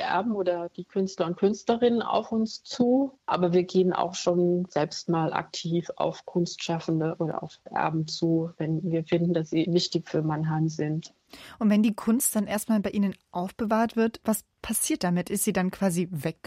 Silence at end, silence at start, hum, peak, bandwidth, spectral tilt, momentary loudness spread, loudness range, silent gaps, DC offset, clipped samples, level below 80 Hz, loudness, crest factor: 0.15 s; 0 s; none; -10 dBFS; 16 kHz; -5.5 dB/octave; 7 LU; 3 LU; none; under 0.1%; under 0.1%; -62 dBFS; -27 LUFS; 18 dB